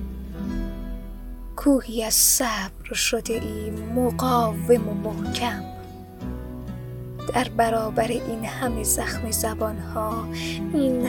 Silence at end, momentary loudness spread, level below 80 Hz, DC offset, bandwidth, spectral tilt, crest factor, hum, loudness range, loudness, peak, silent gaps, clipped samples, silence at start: 0 s; 14 LU; -38 dBFS; under 0.1%; 19.5 kHz; -3.5 dB/octave; 20 dB; none; 5 LU; -24 LUFS; -4 dBFS; none; under 0.1%; 0 s